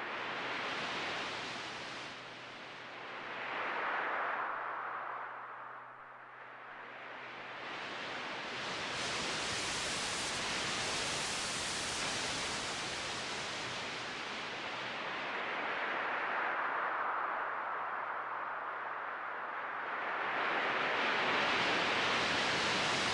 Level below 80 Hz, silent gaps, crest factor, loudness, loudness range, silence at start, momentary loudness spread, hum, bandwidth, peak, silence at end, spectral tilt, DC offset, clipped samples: -68 dBFS; none; 16 dB; -36 LUFS; 8 LU; 0 s; 14 LU; none; 11.5 kHz; -20 dBFS; 0 s; -1.5 dB/octave; under 0.1%; under 0.1%